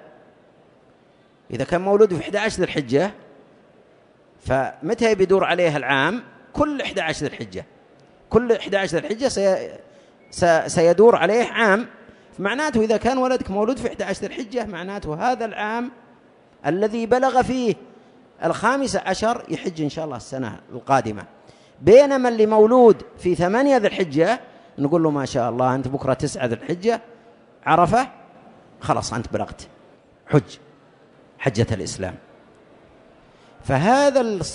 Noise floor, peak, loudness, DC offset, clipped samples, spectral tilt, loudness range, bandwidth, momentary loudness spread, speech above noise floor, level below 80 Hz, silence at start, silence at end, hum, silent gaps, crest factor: -55 dBFS; -2 dBFS; -20 LUFS; under 0.1%; under 0.1%; -5.5 dB/octave; 9 LU; 10.5 kHz; 14 LU; 35 dB; -50 dBFS; 1.5 s; 0 s; none; none; 20 dB